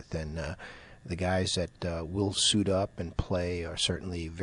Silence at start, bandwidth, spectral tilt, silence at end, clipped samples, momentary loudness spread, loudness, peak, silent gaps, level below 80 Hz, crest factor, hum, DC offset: 0 s; 11 kHz; -4 dB/octave; 0 s; under 0.1%; 14 LU; -31 LUFS; -12 dBFS; none; -46 dBFS; 20 dB; none; under 0.1%